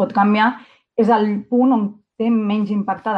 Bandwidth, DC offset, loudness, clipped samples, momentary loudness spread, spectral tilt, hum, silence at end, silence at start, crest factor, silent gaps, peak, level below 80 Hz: 5.4 kHz; under 0.1%; -18 LUFS; under 0.1%; 9 LU; -8.5 dB/octave; none; 0 s; 0 s; 14 dB; none; -4 dBFS; -66 dBFS